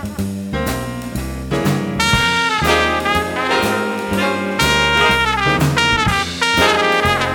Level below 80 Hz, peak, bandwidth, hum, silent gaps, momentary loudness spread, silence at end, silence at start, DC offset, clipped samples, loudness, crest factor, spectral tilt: -32 dBFS; 0 dBFS; over 20 kHz; none; none; 10 LU; 0 s; 0 s; under 0.1%; under 0.1%; -16 LUFS; 16 dB; -4 dB/octave